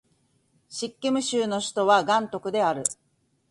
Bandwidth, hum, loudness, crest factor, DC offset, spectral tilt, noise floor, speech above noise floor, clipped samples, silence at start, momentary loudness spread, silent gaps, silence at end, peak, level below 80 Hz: 11.5 kHz; none; -25 LUFS; 20 dB; under 0.1%; -3 dB/octave; -67 dBFS; 43 dB; under 0.1%; 0.7 s; 13 LU; none; 0.6 s; -6 dBFS; -70 dBFS